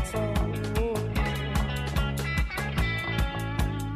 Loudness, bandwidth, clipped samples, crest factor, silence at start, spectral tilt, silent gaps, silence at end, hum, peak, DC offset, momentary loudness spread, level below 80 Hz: -29 LUFS; 15 kHz; under 0.1%; 14 dB; 0 s; -5.5 dB/octave; none; 0 s; none; -12 dBFS; under 0.1%; 2 LU; -32 dBFS